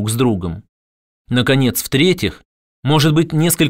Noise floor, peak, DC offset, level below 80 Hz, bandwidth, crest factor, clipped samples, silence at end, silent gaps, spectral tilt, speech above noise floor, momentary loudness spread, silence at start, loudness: under -90 dBFS; -2 dBFS; under 0.1%; -44 dBFS; 16.5 kHz; 14 dB; under 0.1%; 0 s; 0.69-1.25 s, 2.45-2.83 s; -5 dB/octave; over 75 dB; 10 LU; 0 s; -16 LUFS